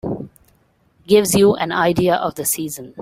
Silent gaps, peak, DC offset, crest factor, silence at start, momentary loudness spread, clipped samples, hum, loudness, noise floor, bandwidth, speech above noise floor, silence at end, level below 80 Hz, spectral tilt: none; -2 dBFS; under 0.1%; 16 dB; 0.05 s; 14 LU; under 0.1%; none; -17 LUFS; -58 dBFS; 16 kHz; 42 dB; 0 s; -50 dBFS; -4.5 dB/octave